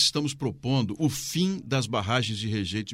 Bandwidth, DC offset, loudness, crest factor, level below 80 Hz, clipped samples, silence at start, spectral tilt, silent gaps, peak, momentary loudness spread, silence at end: 16 kHz; under 0.1%; -27 LUFS; 18 dB; -56 dBFS; under 0.1%; 0 s; -4.5 dB/octave; none; -8 dBFS; 4 LU; 0 s